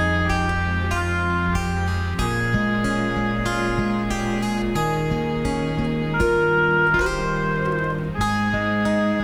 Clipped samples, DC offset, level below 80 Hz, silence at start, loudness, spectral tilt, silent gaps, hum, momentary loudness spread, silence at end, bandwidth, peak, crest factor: under 0.1%; under 0.1%; -32 dBFS; 0 s; -22 LUFS; -6 dB/octave; none; none; 5 LU; 0 s; 14.5 kHz; -6 dBFS; 14 dB